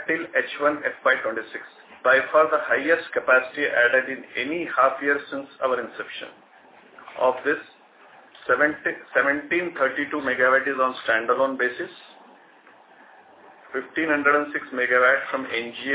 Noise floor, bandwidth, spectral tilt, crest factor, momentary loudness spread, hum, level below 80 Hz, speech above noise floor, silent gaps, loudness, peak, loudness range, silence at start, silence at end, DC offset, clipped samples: -52 dBFS; 4 kHz; -7 dB/octave; 20 dB; 14 LU; none; -70 dBFS; 29 dB; none; -22 LUFS; -4 dBFS; 6 LU; 0 s; 0 s; under 0.1%; under 0.1%